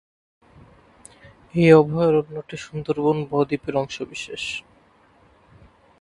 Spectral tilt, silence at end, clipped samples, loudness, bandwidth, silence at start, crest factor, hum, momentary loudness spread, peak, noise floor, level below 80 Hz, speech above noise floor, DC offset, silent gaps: -6.5 dB/octave; 1.4 s; under 0.1%; -21 LUFS; 11.5 kHz; 1.55 s; 22 dB; none; 18 LU; 0 dBFS; -56 dBFS; -56 dBFS; 36 dB; under 0.1%; none